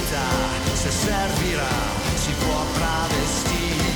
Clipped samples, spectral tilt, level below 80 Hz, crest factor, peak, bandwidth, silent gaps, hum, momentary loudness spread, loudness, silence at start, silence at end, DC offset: under 0.1%; -3.5 dB/octave; -30 dBFS; 12 dB; -10 dBFS; over 20 kHz; none; none; 1 LU; -22 LUFS; 0 s; 0 s; under 0.1%